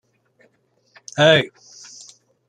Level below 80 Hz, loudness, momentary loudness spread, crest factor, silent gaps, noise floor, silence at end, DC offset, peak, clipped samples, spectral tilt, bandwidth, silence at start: -64 dBFS; -17 LUFS; 25 LU; 22 dB; none; -63 dBFS; 1.05 s; under 0.1%; -2 dBFS; under 0.1%; -4 dB/octave; 9.6 kHz; 1.15 s